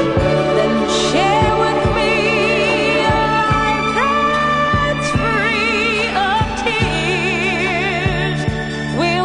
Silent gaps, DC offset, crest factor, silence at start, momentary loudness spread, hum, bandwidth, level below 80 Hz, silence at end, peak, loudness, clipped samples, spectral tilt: none; under 0.1%; 14 dB; 0 s; 3 LU; none; 10.5 kHz; -32 dBFS; 0 s; -2 dBFS; -15 LUFS; under 0.1%; -5 dB/octave